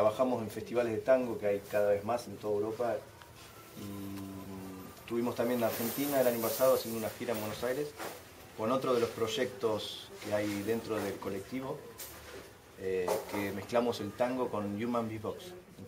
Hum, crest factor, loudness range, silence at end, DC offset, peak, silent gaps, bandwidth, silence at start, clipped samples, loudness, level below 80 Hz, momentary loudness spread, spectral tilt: none; 18 dB; 5 LU; 0 s; under 0.1%; -16 dBFS; none; 16 kHz; 0 s; under 0.1%; -34 LUFS; -66 dBFS; 16 LU; -5 dB/octave